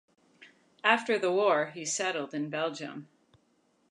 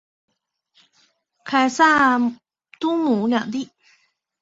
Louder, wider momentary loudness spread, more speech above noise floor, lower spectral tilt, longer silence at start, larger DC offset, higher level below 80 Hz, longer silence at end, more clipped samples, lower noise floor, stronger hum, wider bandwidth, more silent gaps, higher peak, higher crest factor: second, -29 LUFS vs -19 LUFS; second, 12 LU vs 15 LU; second, 41 dB vs 47 dB; about the same, -3 dB/octave vs -4 dB/octave; second, 0.4 s vs 1.45 s; neither; second, -86 dBFS vs -64 dBFS; about the same, 0.85 s vs 0.75 s; neither; first, -70 dBFS vs -65 dBFS; neither; first, 11 kHz vs 8 kHz; neither; second, -8 dBFS vs -4 dBFS; first, 24 dB vs 18 dB